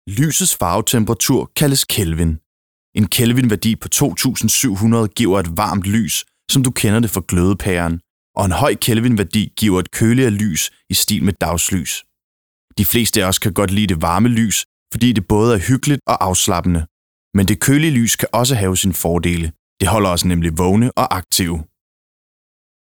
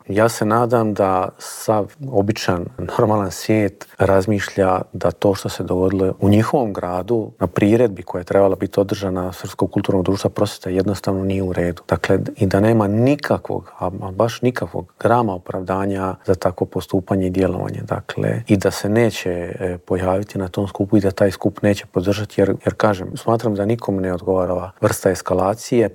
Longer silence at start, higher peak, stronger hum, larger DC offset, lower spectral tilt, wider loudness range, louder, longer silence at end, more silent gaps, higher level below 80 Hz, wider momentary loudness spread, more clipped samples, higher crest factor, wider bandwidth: about the same, 0.05 s vs 0.1 s; about the same, -2 dBFS vs -2 dBFS; neither; first, 0.2% vs under 0.1%; second, -4.5 dB/octave vs -6.5 dB/octave; about the same, 2 LU vs 2 LU; first, -16 LUFS vs -19 LUFS; first, 1.35 s vs 0 s; first, 2.46-2.93 s, 8.10-8.34 s, 12.24-12.68 s, 14.65-14.86 s, 16.91-17.31 s, 19.59-19.77 s vs none; first, -36 dBFS vs -50 dBFS; about the same, 6 LU vs 8 LU; neither; about the same, 14 dB vs 18 dB; first, over 20 kHz vs 17.5 kHz